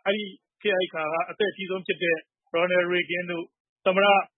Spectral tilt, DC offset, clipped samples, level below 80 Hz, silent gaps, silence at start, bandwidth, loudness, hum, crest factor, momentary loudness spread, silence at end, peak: -9 dB/octave; under 0.1%; under 0.1%; -80 dBFS; 3.60-3.76 s; 0.05 s; 4.1 kHz; -26 LUFS; none; 18 dB; 11 LU; 0.1 s; -8 dBFS